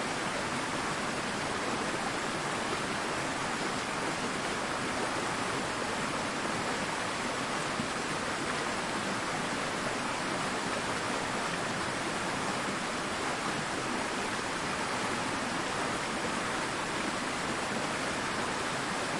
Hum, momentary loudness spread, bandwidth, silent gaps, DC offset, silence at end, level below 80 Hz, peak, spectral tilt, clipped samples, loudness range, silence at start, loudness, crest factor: none; 1 LU; 11.5 kHz; none; under 0.1%; 0 s; -58 dBFS; -18 dBFS; -3 dB/octave; under 0.1%; 0 LU; 0 s; -32 LUFS; 14 dB